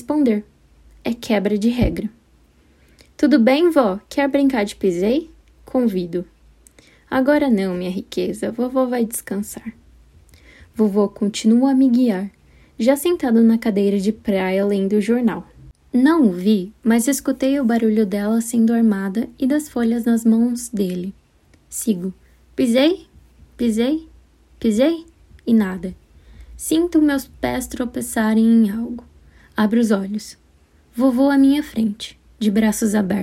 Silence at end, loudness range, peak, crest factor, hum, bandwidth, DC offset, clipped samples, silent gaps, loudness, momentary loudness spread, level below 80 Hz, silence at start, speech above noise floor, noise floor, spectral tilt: 0 s; 4 LU; -2 dBFS; 16 dB; none; 16 kHz; under 0.1%; under 0.1%; none; -19 LUFS; 14 LU; -44 dBFS; 0 s; 37 dB; -54 dBFS; -5.5 dB/octave